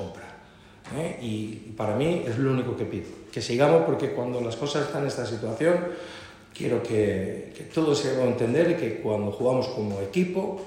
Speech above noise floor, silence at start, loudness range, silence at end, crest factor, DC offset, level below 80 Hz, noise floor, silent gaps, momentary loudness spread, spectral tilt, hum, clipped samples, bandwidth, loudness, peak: 24 dB; 0 s; 2 LU; 0 s; 18 dB; under 0.1%; -58 dBFS; -50 dBFS; none; 14 LU; -6.5 dB/octave; none; under 0.1%; 14 kHz; -26 LUFS; -8 dBFS